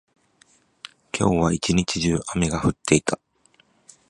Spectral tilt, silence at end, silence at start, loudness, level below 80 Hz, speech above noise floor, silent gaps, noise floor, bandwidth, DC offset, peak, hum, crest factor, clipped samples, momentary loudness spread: -5 dB/octave; 0.95 s; 1.15 s; -22 LUFS; -42 dBFS; 39 dB; none; -61 dBFS; 11.5 kHz; under 0.1%; -2 dBFS; none; 22 dB; under 0.1%; 17 LU